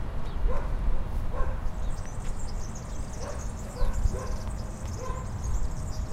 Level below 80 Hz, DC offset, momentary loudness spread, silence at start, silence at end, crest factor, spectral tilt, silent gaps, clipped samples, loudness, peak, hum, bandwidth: -30 dBFS; under 0.1%; 5 LU; 0 s; 0 s; 16 dB; -6 dB/octave; none; under 0.1%; -35 LUFS; -12 dBFS; none; 10 kHz